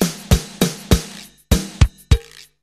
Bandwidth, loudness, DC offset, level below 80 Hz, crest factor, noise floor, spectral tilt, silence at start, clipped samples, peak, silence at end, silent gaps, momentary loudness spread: 14 kHz; -19 LUFS; under 0.1%; -22 dBFS; 18 dB; -38 dBFS; -5 dB/octave; 0 s; under 0.1%; 0 dBFS; 0.4 s; none; 4 LU